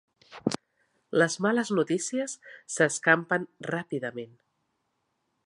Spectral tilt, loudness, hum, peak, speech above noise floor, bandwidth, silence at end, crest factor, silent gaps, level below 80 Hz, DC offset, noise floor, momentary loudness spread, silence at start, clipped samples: -4 dB/octave; -28 LUFS; none; -6 dBFS; 50 dB; 11.5 kHz; 1.2 s; 24 dB; none; -76 dBFS; under 0.1%; -77 dBFS; 14 LU; 0.3 s; under 0.1%